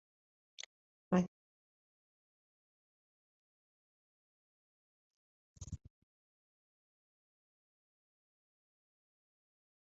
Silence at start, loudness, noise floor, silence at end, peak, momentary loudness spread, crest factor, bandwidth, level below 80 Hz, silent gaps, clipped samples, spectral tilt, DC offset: 0.6 s; -39 LUFS; under -90 dBFS; 4.15 s; -18 dBFS; 18 LU; 32 dB; 6.4 kHz; -68 dBFS; 0.66-1.11 s, 1.28-5.54 s; under 0.1%; -7 dB/octave; under 0.1%